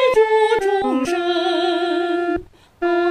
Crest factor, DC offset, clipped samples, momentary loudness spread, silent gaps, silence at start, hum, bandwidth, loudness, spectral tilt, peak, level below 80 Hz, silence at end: 12 dB; under 0.1%; under 0.1%; 8 LU; none; 0 s; none; 12.5 kHz; -19 LUFS; -4 dB/octave; -6 dBFS; -50 dBFS; 0 s